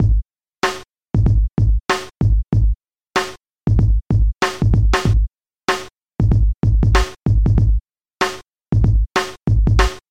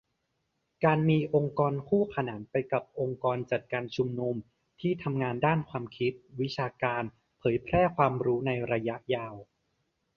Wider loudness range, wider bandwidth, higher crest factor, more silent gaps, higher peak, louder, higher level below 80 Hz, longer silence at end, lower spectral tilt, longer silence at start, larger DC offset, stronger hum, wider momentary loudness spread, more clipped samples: about the same, 2 LU vs 3 LU; first, 10 kHz vs 6.8 kHz; second, 16 dB vs 22 dB; neither; first, -2 dBFS vs -8 dBFS; first, -18 LUFS vs -30 LUFS; first, -20 dBFS vs -58 dBFS; second, 0.1 s vs 0.75 s; second, -6 dB/octave vs -8.5 dB/octave; second, 0 s vs 0.8 s; first, 0.4% vs under 0.1%; neither; about the same, 8 LU vs 9 LU; neither